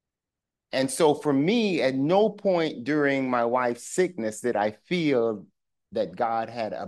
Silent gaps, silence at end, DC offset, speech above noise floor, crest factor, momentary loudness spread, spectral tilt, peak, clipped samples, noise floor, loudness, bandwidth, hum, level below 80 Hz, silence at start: none; 0 s; under 0.1%; 63 dB; 16 dB; 7 LU; -5 dB/octave; -8 dBFS; under 0.1%; -88 dBFS; -25 LUFS; 12.5 kHz; none; -74 dBFS; 0.75 s